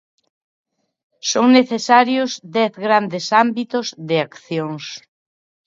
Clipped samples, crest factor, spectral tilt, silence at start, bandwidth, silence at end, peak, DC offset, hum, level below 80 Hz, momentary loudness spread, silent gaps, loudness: under 0.1%; 18 dB; -4 dB/octave; 1.25 s; 7.6 kHz; 0.7 s; 0 dBFS; under 0.1%; none; -72 dBFS; 13 LU; none; -17 LUFS